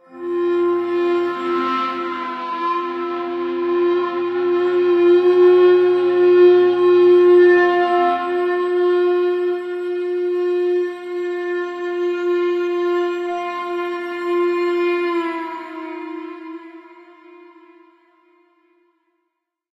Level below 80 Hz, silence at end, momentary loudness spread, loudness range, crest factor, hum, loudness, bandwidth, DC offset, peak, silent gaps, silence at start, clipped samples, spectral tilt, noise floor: -74 dBFS; 2.95 s; 13 LU; 11 LU; 14 dB; none; -17 LUFS; 5.4 kHz; under 0.1%; -4 dBFS; none; 0.1 s; under 0.1%; -6 dB/octave; -76 dBFS